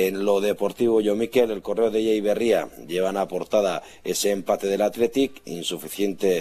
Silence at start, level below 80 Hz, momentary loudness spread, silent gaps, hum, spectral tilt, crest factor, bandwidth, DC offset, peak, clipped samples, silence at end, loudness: 0 s; -58 dBFS; 7 LU; none; none; -4.5 dB/octave; 16 dB; 14.5 kHz; under 0.1%; -8 dBFS; under 0.1%; 0 s; -23 LUFS